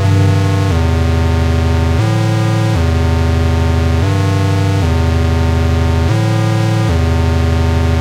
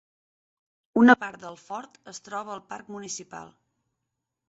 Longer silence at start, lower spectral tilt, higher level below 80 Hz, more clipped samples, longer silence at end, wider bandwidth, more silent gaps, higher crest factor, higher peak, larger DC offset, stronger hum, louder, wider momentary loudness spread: second, 0 s vs 0.95 s; first, -7 dB/octave vs -4 dB/octave; first, -20 dBFS vs -72 dBFS; neither; second, 0 s vs 1.05 s; first, 12.5 kHz vs 8 kHz; neither; second, 8 dB vs 26 dB; about the same, -4 dBFS vs -2 dBFS; neither; neither; first, -13 LUFS vs -23 LUFS; second, 0 LU vs 25 LU